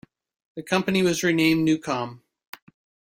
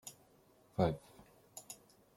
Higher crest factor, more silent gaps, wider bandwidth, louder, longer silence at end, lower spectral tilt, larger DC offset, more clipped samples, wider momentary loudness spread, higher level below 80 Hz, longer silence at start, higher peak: about the same, 20 dB vs 24 dB; neither; about the same, 16.5 kHz vs 16.5 kHz; first, -22 LUFS vs -39 LUFS; first, 1 s vs 0.4 s; about the same, -5 dB/octave vs -6 dB/octave; neither; neither; second, 16 LU vs 19 LU; first, -60 dBFS vs -66 dBFS; first, 0.55 s vs 0.05 s; first, -6 dBFS vs -18 dBFS